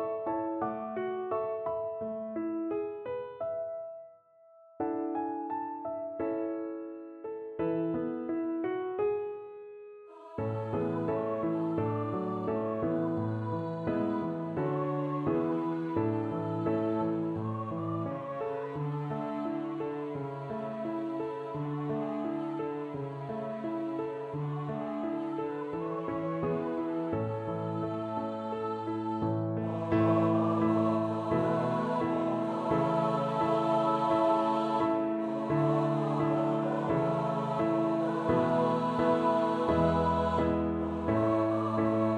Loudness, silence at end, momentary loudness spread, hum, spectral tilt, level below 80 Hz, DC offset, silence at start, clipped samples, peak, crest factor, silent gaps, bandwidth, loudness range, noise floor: -32 LUFS; 0 s; 9 LU; none; -9 dB/octave; -58 dBFS; under 0.1%; 0 s; under 0.1%; -16 dBFS; 16 dB; none; 8.6 kHz; 7 LU; -59 dBFS